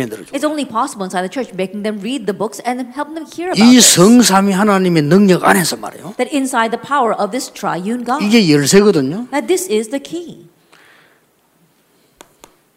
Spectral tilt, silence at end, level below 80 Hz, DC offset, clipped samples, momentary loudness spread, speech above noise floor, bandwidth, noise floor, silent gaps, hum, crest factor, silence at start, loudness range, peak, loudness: -4 dB/octave; 2.4 s; -56 dBFS; under 0.1%; under 0.1%; 15 LU; 42 dB; 16.5 kHz; -56 dBFS; none; none; 14 dB; 0 s; 10 LU; 0 dBFS; -13 LUFS